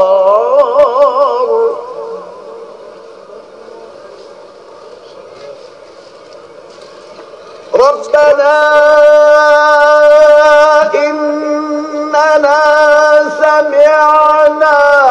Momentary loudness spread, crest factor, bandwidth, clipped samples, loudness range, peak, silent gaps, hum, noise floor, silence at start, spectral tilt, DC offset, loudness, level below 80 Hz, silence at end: 11 LU; 10 dB; 8.6 kHz; 2%; 12 LU; 0 dBFS; none; none; -34 dBFS; 0 s; -2.5 dB/octave; under 0.1%; -7 LUFS; -54 dBFS; 0 s